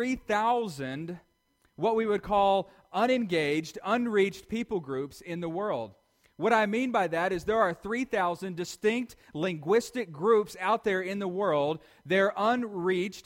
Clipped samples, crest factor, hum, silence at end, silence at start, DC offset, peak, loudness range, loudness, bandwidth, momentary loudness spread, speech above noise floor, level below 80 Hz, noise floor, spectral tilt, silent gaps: under 0.1%; 18 dB; none; 0.05 s; 0 s; under 0.1%; -10 dBFS; 2 LU; -29 LUFS; 16.5 kHz; 10 LU; 42 dB; -60 dBFS; -70 dBFS; -5.5 dB/octave; none